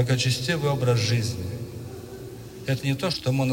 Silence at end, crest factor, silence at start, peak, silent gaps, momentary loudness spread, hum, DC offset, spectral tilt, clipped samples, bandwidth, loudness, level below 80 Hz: 0 s; 16 dB; 0 s; -10 dBFS; none; 16 LU; none; under 0.1%; -5 dB/octave; under 0.1%; 16.5 kHz; -25 LUFS; -52 dBFS